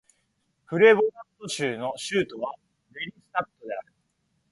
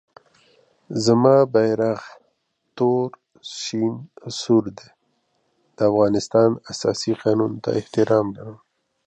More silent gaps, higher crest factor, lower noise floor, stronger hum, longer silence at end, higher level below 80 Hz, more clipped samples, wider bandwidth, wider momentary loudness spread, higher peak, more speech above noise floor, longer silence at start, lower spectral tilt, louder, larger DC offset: neither; about the same, 22 dB vs 20 dB; about the same, -73 dBFS vs -71 dBFS; neither; first, 0.7 s vs 0.5 s; second, -70 dBFS vs -60 dBFS; neither; first, 11.5 kHz vs 8.8 kHz; first, 19 LU vs 15 LU; about the same, -4 dBFS vs -2 dBFS; about the same, 48 dB vs 51 dB; second, 0.7 s vs 0.9 s; second, -4.5 dB/octave vs -6 dB/octave; second, -25 LUFS vs -20 LUFS; neither